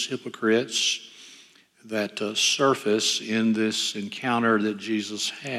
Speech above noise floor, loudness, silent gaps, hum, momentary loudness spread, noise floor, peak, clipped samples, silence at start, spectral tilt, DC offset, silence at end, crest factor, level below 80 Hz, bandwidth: 29 dB; -24 LUFS; none; none; 8 LU; -54 dBFS; -8 dBFS; under 0.1%; 0 s; -2.5 dB/octave; under 0.1%; 0 s; 18 dB; -80 dBFS; 14.5 kHz